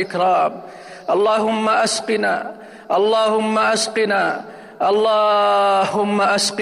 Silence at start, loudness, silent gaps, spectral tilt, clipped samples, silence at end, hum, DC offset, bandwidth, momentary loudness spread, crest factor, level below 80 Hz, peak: 0 s; -17 LUFS; none; -3 dB/octave; under 0.1%; 0 s; none; under 0.1%; 15.5 kHz; 13 LU; 10 dB; -66 dBFS; -8 dBFS